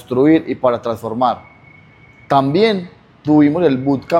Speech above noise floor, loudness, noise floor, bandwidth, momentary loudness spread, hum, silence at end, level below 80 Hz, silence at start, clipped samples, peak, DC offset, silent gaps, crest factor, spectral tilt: 31 dB; -15 LUFS; -45 dBFS; 9.4 kHz; 10 LU; none; 0 s; -54 dBFS; 0.1 s; under 0.1%; 0 dBFS; under 0.1%; none; 14 dB; -8 dB/octave